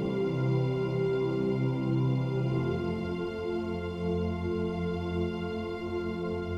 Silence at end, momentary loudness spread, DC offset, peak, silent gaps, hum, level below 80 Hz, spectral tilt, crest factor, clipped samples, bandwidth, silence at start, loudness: 0 s; 5 LU; under 0.1%; -18 dBFS; none; none; -50 dBFS; -9 dB/octave; 12 dB; under 0.1%; 7.4 kHz; 0 s; -31 LUFS